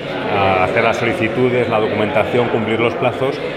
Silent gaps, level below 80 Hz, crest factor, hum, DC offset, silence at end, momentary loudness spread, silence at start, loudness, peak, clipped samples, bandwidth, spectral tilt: none; -48 dBFS; 16 dB; none; under 0.1%; 0 s; 3 LU; 0 s; -16 LUFS; 0 dBFS; under 0.1%; 13 kHz; -6.5 dB/octave